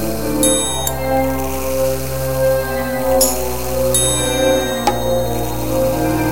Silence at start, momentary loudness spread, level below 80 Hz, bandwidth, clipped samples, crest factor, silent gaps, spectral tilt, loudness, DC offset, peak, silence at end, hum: 0 s; 6 LU; -30 dBFS; 17.5 kHz; under 0.1%; 16 dB; none; -4 dB/octave; -17 LUFS; 4%; 0 dBFS; 0 s; none